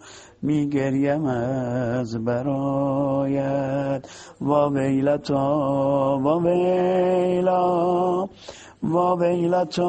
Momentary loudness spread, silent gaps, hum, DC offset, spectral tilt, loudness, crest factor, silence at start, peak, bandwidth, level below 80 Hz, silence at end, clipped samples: 6 LU; none; none; under 0.1%; -8 dB/octave; -22 LUFS; 16 dB; 0.05 s; -6 dBFS; 8.8 kHz; -56 dBFS; 0 s; under 0.1%